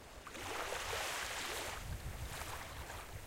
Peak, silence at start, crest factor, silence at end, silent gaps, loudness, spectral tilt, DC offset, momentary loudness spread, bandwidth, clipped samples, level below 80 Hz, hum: -28 dBFS; 0 s; 16 dB; 0 s; none; -43 LUFS; -2.5 dB/octave; under 0.1%; 8 LU; 16.5 kHz; under 0.1%; -54 dBFS; none